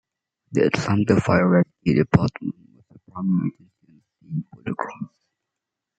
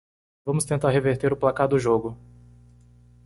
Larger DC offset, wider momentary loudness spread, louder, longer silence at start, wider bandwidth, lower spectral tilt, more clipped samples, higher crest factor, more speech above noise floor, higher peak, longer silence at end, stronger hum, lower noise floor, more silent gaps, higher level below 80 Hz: neither; first, 15 LU vs 8 LU; about the same, -22 LUFS vs -23 LUFS; about the same, 0.5 s vs 0.45 s; second, 8.6 kHz vs 11.5 kHz; first, -7.5 dB/octave vs -6 dB/octave; neither; about the same, 22 dB vs 18 dB; first, 65 dB vs 30 dB; first, -2 dBFS vs -6 dBFS; second, 0.9 s vs 1.1 s; second, none vs 60 Hz at -45 dBFS; first, -84 dBFS vs -53 dBFS; neither; about the same, -52 dBFS vs -52 dBFS